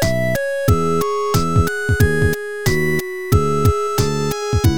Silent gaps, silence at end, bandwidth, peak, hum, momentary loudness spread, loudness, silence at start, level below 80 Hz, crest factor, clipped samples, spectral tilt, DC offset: none; 0 s; over 20 kHz; 0 dBFS; none; 4 LU; -18 LUFS; 0 s; -30 dBFS; 16 dB; under 0.1%; -5.5 dB/octave; 3%